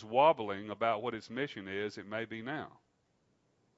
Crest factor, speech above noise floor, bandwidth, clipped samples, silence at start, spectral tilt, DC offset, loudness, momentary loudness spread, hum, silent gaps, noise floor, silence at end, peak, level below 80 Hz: 22 dB; 41 dB; 7.6 kHz; under 0.1%; 0 s; -3 dB/octave; under 0.1%; -35 LUFS; 13 LU; none; none; -75 dBFS; 1.1 s; -14 dBFS; -80 dBFS